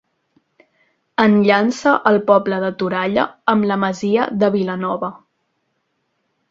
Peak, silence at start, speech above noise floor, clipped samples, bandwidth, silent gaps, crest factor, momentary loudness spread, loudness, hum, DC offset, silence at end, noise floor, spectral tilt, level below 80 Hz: 0 dBFS; 1.2 s; 53 dB; under 0.1%; 7.8 kHz; none; 18 dB; 8 LU; -17 LUFS; none; under 0.1%; 1.35 s; -70 dBFS; -6.5 dB/octave; -60 dBFS